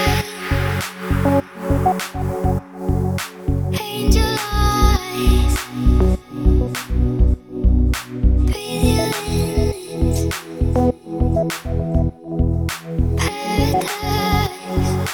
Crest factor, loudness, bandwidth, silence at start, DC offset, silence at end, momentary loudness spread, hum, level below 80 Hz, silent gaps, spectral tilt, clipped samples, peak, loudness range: 16 dB; -20 LUFS; 19.5 kHz; 0 s; under 0.1%; 0 s; 6 LU; none; -22 dBFS; none; -6 dB/octave; under 0.1%; -2 dBFS; 2 LU